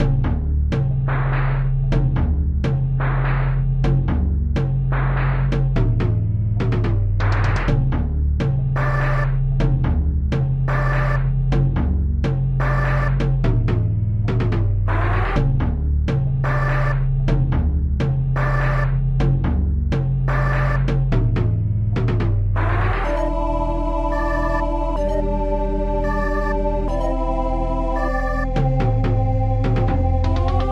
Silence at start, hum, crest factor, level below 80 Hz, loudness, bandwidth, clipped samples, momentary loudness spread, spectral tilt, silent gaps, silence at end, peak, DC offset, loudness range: 0 s; none; 12 dB; -22 dBFS; -20 LUFS; 6.6 kHz; under 0.1%; 3 LU; -9 dB/octave; none; 0 s; -6 dBFS; under 0.1%; 2 LU